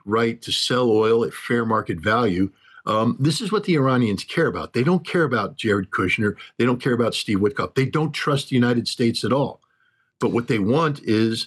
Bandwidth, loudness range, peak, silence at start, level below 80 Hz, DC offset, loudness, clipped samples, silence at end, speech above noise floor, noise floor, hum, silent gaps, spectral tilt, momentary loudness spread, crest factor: 12.5 kHz; 1 LU; -10 dBFS; 0.05 s; -60 dBFS; under 0.1%; -21 LUFS; under 0.1%; 0 s; 44 dB; -65 dBFS; none; none; -6 dB/octave; 4 LU; 12 dB